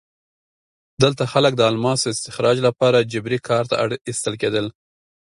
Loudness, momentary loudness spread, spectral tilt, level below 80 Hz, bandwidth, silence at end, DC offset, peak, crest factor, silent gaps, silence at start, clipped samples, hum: -19 LUFS; 8 LU; -4.5 dB/octave; -56 dBFS; 11.5 kHz; 0.55 s; under 0.1%; 0 dBFS; 20 dB; 4.01-4.05 s; 1 s; under 0.1%; none